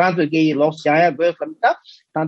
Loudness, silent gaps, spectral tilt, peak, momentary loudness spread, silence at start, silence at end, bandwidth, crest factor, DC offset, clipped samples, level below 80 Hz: -17 LUFS; none; -7 dB/octave; -2 dBFS; 7 LU; 0 s; 0 s; 7.8 kHz; 14 dB; under 0.1%; under 0.1%; -70 dBFS